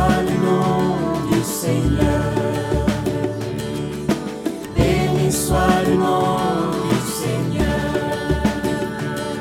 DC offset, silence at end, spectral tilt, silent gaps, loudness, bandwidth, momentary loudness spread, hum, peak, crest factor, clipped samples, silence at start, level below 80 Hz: under 0.1%; 0 s; -6 dB/octave; none; -20 LUFS; 17.5 kHz; 7 LU; none; -2 dBFS; 16 dB; under 0.1%; 0 s; -32 dBFS